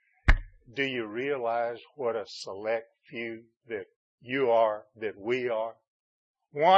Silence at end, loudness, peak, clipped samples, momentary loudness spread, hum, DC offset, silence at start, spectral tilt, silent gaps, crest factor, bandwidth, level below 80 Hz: 0 s; -31 LUFS; -6 dBFS; under 0.1%; 14 LU; none; under 0.1%; 0.25 s; -6 dB/octave; 3.96-4.18 s, 5.88-6.34 s; 22 dB; 8.6 kHz; -38 dBFS